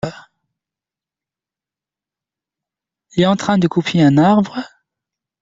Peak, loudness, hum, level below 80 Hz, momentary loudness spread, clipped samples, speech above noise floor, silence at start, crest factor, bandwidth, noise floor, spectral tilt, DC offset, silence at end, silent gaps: -2 dBFS; -15 LUFS; none; -54 dBFS; 16 LU; under 0.1%; 75 dB; 0.05 s; 16 dB; 7.8 kHz; -89 dBFS; -6.5 dB/octave; under 0.1%; 0.75 s; none